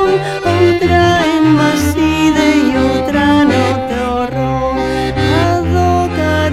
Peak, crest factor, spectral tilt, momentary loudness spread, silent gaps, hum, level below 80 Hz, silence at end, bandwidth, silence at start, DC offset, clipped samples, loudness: 0 dBFS; 12 dB; -6 dB/octave; 6 LU; none; none; -30 dBFS; 0 s; 15 kHz; 0 s; under 0.1%; under 0.1%; -12 LUFS